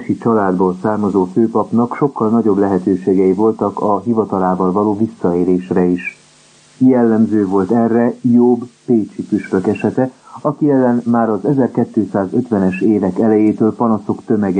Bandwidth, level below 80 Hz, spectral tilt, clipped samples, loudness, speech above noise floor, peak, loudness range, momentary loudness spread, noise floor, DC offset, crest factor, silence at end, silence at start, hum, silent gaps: 9.4 kHz; -58 dBFS; -9.5 dB/octave; under 0.1%; -15 LUFS; 33 dB; 0 dBFS; 2 LU; 5 LU; -47 dBFS; under 0.1%; 14 dB; 0 s; 0 s; none; none